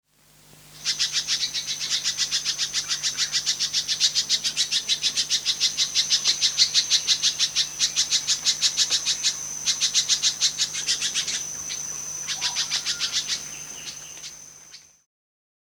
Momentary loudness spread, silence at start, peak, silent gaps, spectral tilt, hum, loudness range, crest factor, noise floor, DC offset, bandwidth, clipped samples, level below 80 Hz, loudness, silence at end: 10 LU; 0.55 s; -4 dBFS; none; 2.5 dB/octave; 50 Hz at -55 dBFS; 7 LU; 22 dB; -55 dBFS; under 0.1%; over 20 kHz; under 0.1%; -62 dBFS; -22 LUFS; 0.85 s